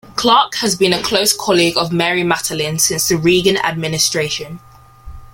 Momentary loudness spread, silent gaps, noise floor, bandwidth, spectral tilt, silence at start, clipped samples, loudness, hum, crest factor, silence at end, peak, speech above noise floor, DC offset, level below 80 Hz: 6 LU; none; -35 dBFS; 16.5 kHz; -3 dB/octave; 0.05 s; under 0.1%; -14 LUFS; none; 16 dB; 0.05 s; 0 dBFS; 20 dB; under 0.1%; -44 dBFS